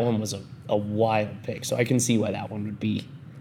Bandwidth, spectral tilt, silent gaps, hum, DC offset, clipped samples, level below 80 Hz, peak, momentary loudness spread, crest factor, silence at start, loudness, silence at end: 17 kHz; -5 dB/octave; none; none; under 0.1%; under 0.1%; -68 dBFS; -8 dBFS; 10 LU; 18 dB; 0 s; -27 LUFS; 0 s